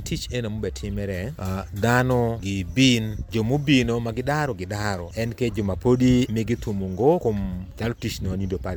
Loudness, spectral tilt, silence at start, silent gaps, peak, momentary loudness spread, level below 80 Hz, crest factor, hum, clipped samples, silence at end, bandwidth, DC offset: -24 LUFS; -6 dB/octave; 0 s; none; -4 dBFS; 10 LU; -38 dBFS; 18 dB; none; under 0.1%; 0 s; over 20 kHz; under 0.1%